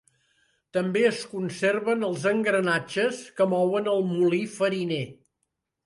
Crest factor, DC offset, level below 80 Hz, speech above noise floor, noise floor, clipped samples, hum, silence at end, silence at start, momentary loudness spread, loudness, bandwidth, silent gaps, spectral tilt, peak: 16 dB; under 0.1%; -72 dBFS; 55 dB; -80 dBFS; under 0.1%; none; 0.75 s; 0.75 s; 7 LU; -25 LUFS; 11.5 kHz; none; -5.5 dB/octave; -10 dBFS